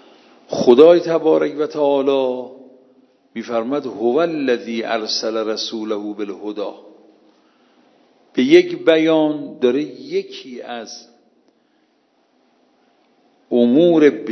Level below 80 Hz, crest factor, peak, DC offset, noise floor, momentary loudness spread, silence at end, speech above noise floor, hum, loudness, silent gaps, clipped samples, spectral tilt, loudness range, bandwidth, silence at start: -74 dBFS; 18 dB; 0 dBFS; under 0.1%; -61 dBFS; 18 LU; 0 s; 45 dB; none; -17 LUFS; none; under 0.1%; -5.5 dB/octave; 11 LU; 6.4 kHz; 0.5 s